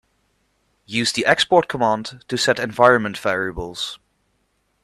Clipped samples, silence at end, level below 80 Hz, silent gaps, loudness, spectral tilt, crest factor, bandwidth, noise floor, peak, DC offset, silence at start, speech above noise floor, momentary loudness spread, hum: under 0.1%; 0.85 s; -48 dBFS; none; -19 LUFS; -3.5 dB/octave; 20 dB; 13.5 kHz; -67 dBFS; 0 dBFS; under 0.1%; 0.9 s; 48 dB; 12 LU; none